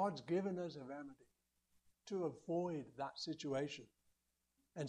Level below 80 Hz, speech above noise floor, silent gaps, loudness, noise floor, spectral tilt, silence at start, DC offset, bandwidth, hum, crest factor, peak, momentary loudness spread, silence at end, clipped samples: -84 dBFS; 41 dB; none; -44 LUFS; -85 dBFS; -6 dB/octave; 0 s; under 0.1%; 10.5 kHz; none; 18 dB; -28 dBFS; 13 LU; 0 s; under 0.1%